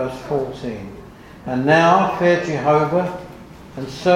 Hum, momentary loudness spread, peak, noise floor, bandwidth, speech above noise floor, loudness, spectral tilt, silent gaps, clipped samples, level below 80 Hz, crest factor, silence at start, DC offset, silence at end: none; 22 LU; 0 dBFS; -38 dBFS; 15 kHz; 21 dB; -18 LUFS; -6.5 dB/octave; none; under 0.1%; -48 dBFS; 18 dB; 0 s; under 0.1%; 0 s